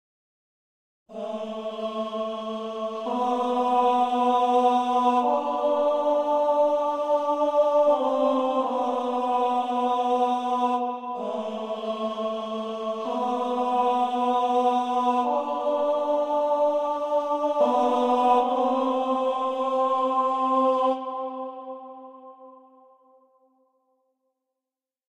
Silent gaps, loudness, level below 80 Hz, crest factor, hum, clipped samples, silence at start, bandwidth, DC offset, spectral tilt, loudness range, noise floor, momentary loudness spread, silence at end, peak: none; -24 LUFS; -74 dBFS; 16 dB; none; under 0.1%; 1.1 s; 9.8 kHz; under 0.1%; -5 dB/octave; 6 LU; -90 dBFS; 10 LU; 2.55 s; -8 dBFS